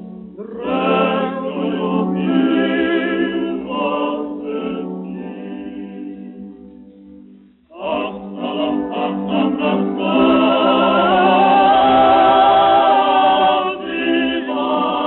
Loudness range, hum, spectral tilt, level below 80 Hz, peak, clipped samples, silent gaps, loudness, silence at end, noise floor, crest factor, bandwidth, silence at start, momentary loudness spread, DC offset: 16 LU; none; -3.5 dB/octave; -52 dBFS; -2 dBFS; under 0.1%; none; -16 LUFS; 0 s; -45 dBFS; 14 dB; 4.2 kHz; 0 s; 18 LU; under 0.1%